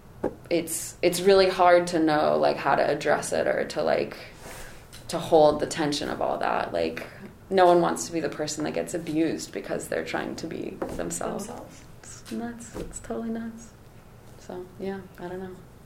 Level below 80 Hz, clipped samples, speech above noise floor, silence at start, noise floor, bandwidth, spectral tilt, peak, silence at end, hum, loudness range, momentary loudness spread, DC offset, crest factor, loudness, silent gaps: -52 dBFS; under 0.1%; 23 dB; 0.05 s; -49 dBFS; 16 kHz; -4.5 dB/octave; -6 dBFS; 0 s; none; 14 LU; 22 LU; under 0.1%; 20 dB; -25 LUFS; none